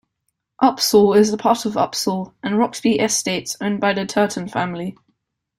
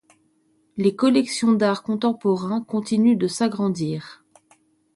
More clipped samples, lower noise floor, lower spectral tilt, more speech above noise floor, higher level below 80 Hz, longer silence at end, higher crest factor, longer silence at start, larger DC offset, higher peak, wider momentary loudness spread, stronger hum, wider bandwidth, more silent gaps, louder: neither; first, -75 dBFS vs -64 dBFS; second, -4 dB/octave vs -6 dB/octave; first, 56 dB vs 43 dB; first, -58 dBFS vs -66 dBFS; second, 0.65 s vs 0.8 s; about the same, 18 dB vs 16 dB; second, 0.6 s vs 0.75 s; neither; first, -2 dBFS vs -6 dBFS; about the same, 9 LU vs 7 LU; neither; first, 16 kHz vs 11.5 kHz; neither; first, -18 LUFS vs -21 LUFS